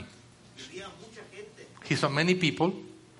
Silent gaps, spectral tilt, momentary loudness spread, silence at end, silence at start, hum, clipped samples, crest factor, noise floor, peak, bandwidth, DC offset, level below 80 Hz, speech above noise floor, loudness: none; -5 dB/octave; 22 LU; 0.2 s; 0 s; none; under 0.1%; 22 dB; -54 dBFS; -10 dBFS; 11.5 kHz; under 0.1%; -68 dBFS; 24 dB; -27 LUFS